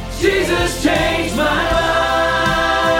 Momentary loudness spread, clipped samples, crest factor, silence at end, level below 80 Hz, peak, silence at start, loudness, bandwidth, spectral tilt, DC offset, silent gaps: 2 LU; under 0.1%; 14 dB; 0 s; -30 dBFS; -2 dBFS; 0 s; -16 LUFS; 17.5 kHz; -4 dB/octave; under 0.1%; none